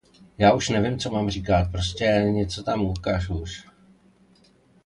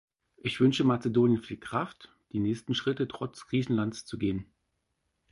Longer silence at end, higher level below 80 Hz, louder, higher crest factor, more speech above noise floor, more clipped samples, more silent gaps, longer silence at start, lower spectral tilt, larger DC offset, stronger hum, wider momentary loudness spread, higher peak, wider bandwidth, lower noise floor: first, 1.25 s vs 0.9 s; first, -38 dBFS vs -60 dBFS; first, -23 LUFS vs -30 LUFS; about the same, 20 dB vs 16 dB; second, 35 dB vs 50 dB; neither; neither; about the same, 0.4 s vs 0.45 s; about the same, -5.5 dB/octave vs -6.5 dB/octave; neither; neither; about the same, 10 LU vs 11 LU; first, -4 dBFS vs -14 dBFS; about the same, 11 kHz vs 11.5 kHz; second, -58 dBFS vs -79 dBFS